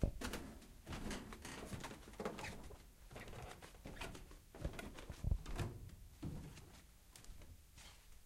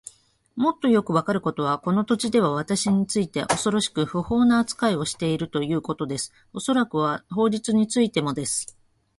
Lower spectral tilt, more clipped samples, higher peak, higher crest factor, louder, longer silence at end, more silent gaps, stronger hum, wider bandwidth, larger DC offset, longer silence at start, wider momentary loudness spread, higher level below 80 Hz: about the same, -5 dB/octave vs -5 dB/octave; neither; second, -22 dBFS vs -4 dBFS; first, 28 dB vs 20 dB; second, -51 LUFS vs -23 LUFS; second, 0 s vs 0.55 s; neither; neither; first, 16 kHz vs 11.5 kHz; neither; second, 0 s vs 0.55 s; first, 15 LU vs 8 LU; about the same, -52 dBFS vs -56 dBFS